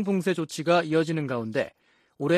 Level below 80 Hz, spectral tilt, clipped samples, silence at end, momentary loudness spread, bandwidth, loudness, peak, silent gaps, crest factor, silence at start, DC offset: -70 dBFS; -6 dB/octave; under 0.1%; 0 s; 9 LU; 14 kHz; -26 LUFS; -8 dBFS; none; 18 dB; 0 s; under 0.1%